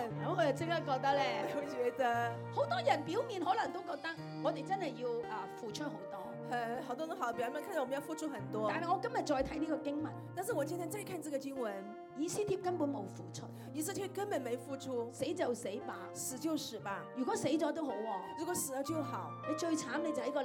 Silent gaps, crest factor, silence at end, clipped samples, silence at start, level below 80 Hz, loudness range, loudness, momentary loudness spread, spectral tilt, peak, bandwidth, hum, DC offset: none; 20 dB; 0 s; under 0.1%; 0 s; -70 dBFS; 5 LU; -38 LUFS; 8 LU; -4.5 dB/octave; -18 dBFS; 17.5 kHz; none; under 0.1%